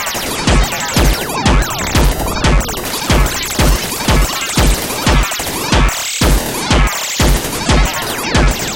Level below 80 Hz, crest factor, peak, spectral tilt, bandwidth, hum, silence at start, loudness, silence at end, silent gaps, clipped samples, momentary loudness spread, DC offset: -16 dBFS; 12 dB; 0 dBFS; -3.5 dB/octave; 17.5 kHz; none; 0 s; -14 LUFS; 0 s; none; under 0.1%; 3 LU; under 0.1%